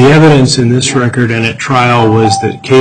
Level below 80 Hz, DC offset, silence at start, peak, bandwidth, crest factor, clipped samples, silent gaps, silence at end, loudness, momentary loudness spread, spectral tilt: -38 dBFS; under 0.1%; 0 s; 0 dBFS; 10.5 kHz; 8 dB; 0.1%; none; 0 s; -8 LUFS; 6 LU; -5.5 dB/octave